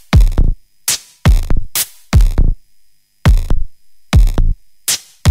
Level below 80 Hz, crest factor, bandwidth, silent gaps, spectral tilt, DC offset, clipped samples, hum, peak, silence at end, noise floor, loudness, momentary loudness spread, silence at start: -14 dBFS; 12 dB; 16 kHz; none; -4 dB/octave; under 0.1%; under 0.1%; none; 0 dBFS; 0 s; -48 dBFS; -16 LUFS; 8 LU; 0.1 s